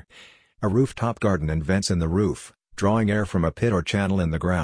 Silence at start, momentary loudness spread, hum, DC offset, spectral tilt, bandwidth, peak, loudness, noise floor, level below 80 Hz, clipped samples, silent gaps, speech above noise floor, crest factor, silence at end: 0.15 s; 4 LU; none; under 0.1%; -6.5 dB/octave; 10.5 kHz; -6 dBFS; -23 LUFS; -51 dBFS; -40 dBFS; under 0.1%; none; 29 dB; 16 dB; 0 s